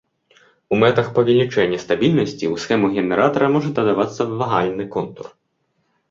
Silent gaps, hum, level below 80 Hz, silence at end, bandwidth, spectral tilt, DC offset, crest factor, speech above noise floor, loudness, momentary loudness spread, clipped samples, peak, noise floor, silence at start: none; none; -54 dBFS; 0.8 s; 7.6 kHz; -6.5 dB/octave; under 0.1%; 18 dB; 51 dB; -18 LUFS; 9 LU; under 0.1%; -2 dBFS; -69 dBFS; 0.7 s